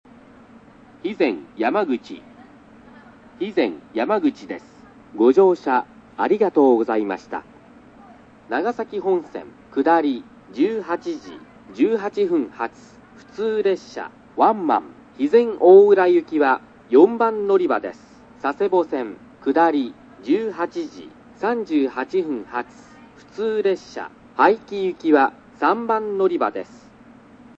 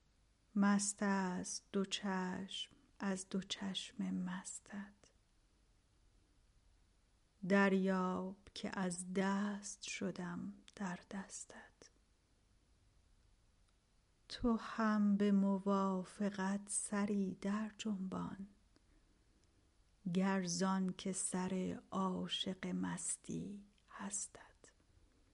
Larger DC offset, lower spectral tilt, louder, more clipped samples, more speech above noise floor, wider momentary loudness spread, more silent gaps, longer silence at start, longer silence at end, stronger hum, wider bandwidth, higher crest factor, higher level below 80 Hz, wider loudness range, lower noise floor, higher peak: neither; first, -6.5 dB/octave vs -4.5 dB/octave; first, -20 LUFS vs -40 LUFS; neither; second, 28 dB vs 35 dB; first, 18 LU vs 15 LU; neither; first, 1.05 s vs 0.55 s; about the same, 0.95 s vs 0.85 s; neither; second, 7.4 kHz vs 11.5 kHz; about the same, 20 dB vs 20 dB; first, -64 dBFS vs -70 dBFS; second, 9 LU vs 12 LU; second, -47 dBFS vs -74 dBFS; first, -2 dBFS vs -22 dBFS